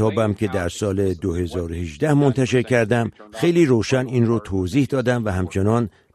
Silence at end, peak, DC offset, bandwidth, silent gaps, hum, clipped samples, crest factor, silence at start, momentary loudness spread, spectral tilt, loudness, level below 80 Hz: 0.25 s; -4 dBFS; under 0.1%; 13.5 kHz; none; none; under 0.1%; 16 dB; 0 s; 7 LU; -7 dB/octave; -20 LUFS; -44 dBFS